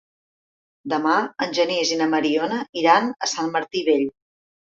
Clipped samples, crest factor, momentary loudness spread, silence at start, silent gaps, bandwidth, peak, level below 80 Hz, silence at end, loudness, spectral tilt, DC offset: under 0.1%; 20 dB; 7 LU; 0.85 s; 2.69-2.73 s; 7.8 kHz; -2 dBFS; -70 dBFS; 0.65 s; -21 LUFS; -3 dB/octave; under 0.1%